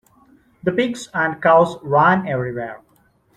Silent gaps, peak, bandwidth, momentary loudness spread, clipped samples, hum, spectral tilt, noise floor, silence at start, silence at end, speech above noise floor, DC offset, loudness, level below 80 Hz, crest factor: none; -2 dBFS; 12.5 kHz; 12 LU; under 0.1%; none; -6 dB/octave; -58 dBFS; 0.65 s; 0.6 s; 41 dB; under 0.1%; -18 LUFS; -56 dBFS; 18 dB